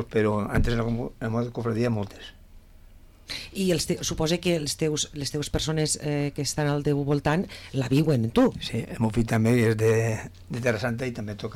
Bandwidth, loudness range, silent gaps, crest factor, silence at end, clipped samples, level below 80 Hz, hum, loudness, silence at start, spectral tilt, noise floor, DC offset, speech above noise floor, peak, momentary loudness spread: 16 kHz; 5 LU; none; 12 dB; 0 s; under 0.1%; -40 dBFS; none; -26 LUFS; 0 s; -5.5 dB/octave; -50 dBFS; under 0.1%; 24 dB; -12 dBFS; 9 LU